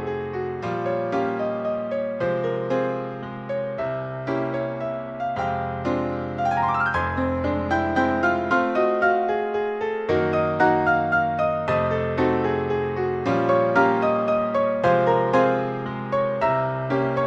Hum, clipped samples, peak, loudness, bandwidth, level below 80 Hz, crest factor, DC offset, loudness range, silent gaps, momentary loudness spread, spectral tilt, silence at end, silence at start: none; under 0.1%; -6 dBFS; -23 LUFS; 8 kHz; -50 dBFS; 16 dB; under 0.1%; 6 LU; none; 8 LU; -7.5 dB/octave; 0 s; 0 s